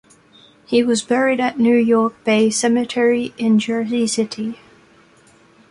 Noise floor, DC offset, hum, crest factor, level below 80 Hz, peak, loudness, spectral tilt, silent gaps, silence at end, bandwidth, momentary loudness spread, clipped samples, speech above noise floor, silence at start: -51 dBFS; under 0.1%; none; 14 dB; -62 dBFS; -4 dBFS; -17 LUFS; -4 dB/octave; none; 1.15 s; 11.5 kHz; 6 LU; under 0.1%; 34 dB; 0.7 s